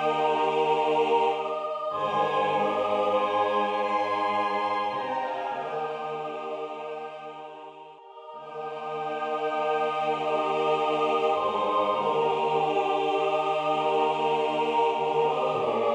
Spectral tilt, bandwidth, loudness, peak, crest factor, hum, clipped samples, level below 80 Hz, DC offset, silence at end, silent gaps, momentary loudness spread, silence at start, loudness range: -5 dB/octave; 9.8 kHz; -26 LUFS; -12 dBFS; 14 dB; none; under 0.1%; -74 dBFS; under 0.1%; 0 s; none; 12 LU; 0 s; 9 LU